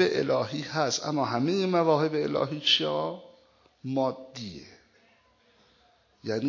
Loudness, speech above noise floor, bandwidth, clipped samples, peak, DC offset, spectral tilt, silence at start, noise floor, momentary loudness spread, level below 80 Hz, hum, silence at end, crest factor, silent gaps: -27 LUFS; 37 dB; 7.6 kHz; under 0.1%; -10 dBFS; under 0.1%; -4.5 dB/octave; 0 s; -64 dBFS; 17 LU; -68 dBFS; none; 0 s; 18 dB; none